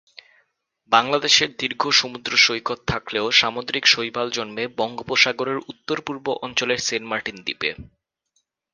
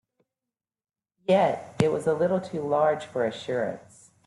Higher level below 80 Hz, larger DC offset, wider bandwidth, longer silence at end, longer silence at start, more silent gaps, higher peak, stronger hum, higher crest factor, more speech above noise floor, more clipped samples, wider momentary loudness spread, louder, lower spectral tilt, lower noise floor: first, -54 dBFS vs -66 dBFS; neither; about the same, 11 kHz vs 11.5 kHz; first, 0.9 s vs 0.45 s; second, 0.9 s vs 1.3 s; neither; first, 0 dBFS vs -6 dBFS; neither; about the same, 22 dB vs 22 dB; second, 49 dB vs over 65 dB; neither; first, 11 LU vs 8 LU; first, -20 LUFS vs -26 LUFS; second, -1.5 dB/octave vs -6.5 dB/octave; second, -71 dBFS vs under -90 dBFS